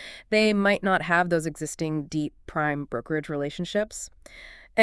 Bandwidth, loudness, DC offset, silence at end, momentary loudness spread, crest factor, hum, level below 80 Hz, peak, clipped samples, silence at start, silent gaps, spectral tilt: 12 kHz; -26 LUFS; under 0.1%; 0 s; 14 LU; 18 dB; none; -54 dBFS; -8 dBFS; under 0.1%; 0 s; none; -5 dB/octave